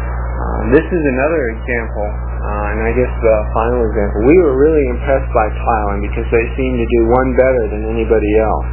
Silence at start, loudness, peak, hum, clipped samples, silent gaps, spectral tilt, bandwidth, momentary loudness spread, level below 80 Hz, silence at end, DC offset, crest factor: 0 s; -15 LUFS; 0 dBFS; 60 Hz at -20 dBFS; under 0.1%; none; -12 dB/octave; 3.2 kHz; 8 LU; -20 dBFS; 0 s; under 0.1%; 14 dB